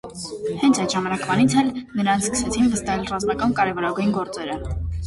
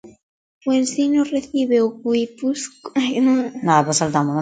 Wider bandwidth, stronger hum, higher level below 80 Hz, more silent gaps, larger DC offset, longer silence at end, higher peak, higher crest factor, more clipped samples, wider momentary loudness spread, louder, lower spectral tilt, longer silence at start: first, 11.5 kHz vs 9.4 kHz; neither; first, -38 dBFS vs -62 dBFS; second, none vs 0.23-0.61 s; neither; about the same, 0 s vs 0 s; second, -6 dBFS vs 0 dBFS; about the same, 16 dB vs 18 dB; neither; first, 10 LU vs 7 LU; second, -22 LUFS vs -19 LUFS; about the same, -4.5 dB/octave vs -5 dB/octave; about the same, 0.05 s vs 0.05 s